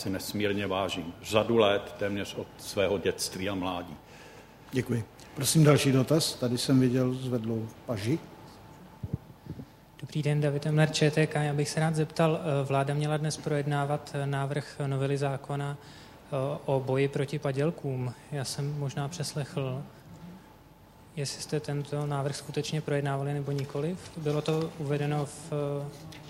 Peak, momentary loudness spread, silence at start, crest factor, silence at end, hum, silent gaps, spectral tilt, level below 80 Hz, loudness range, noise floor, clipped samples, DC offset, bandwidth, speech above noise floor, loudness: -8 dBFS; 18 LU; 0 s; 22 dB; 0 s; none; none; -5.5 dB/octave; -60 dBFS; 9 LU; -54 dBFS; under 0.1%; under 0.1%; 16 kHz; 25 dB; -30 LUFS